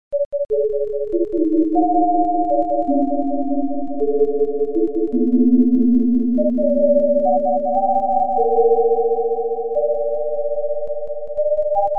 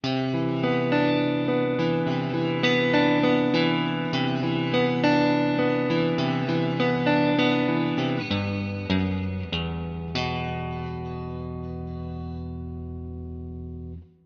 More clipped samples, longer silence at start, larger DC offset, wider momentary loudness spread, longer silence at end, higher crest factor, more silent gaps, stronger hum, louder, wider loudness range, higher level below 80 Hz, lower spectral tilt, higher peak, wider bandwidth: neither; about the same, 0.1 s vs 0.05 s; first, 5% vs under 0.1%; second, 7 LU vs 14 LU; second, 0 s vs 0.2 s; about the same, 12 dB vs 16 dB; first, 0.25-0.31 s vs none; neither; first, -18 LUFS vs -25 LUFS; second, 3 LU vs 9 LU; about the same, -48 dBFS vs -46 dBFS; first, -11.5 dB/octave vs -7 dB/octave; first, -4 dBFS vs -8 dBFS; second, 1.5 kHz vs 7 kHz